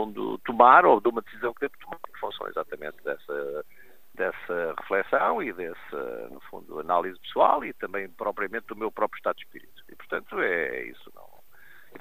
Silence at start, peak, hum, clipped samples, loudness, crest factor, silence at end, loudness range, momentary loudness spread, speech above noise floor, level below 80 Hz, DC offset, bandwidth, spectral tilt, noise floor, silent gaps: 0 s; -2 dBFS; none; under 0.1%; -26 LUFS; 26 dB; 1.1 s; 9 LU; 16 LU; 29 dB; -64 dBFS; 0.5%; 15 kHz; -6 dB/octave; -55 dBFS; none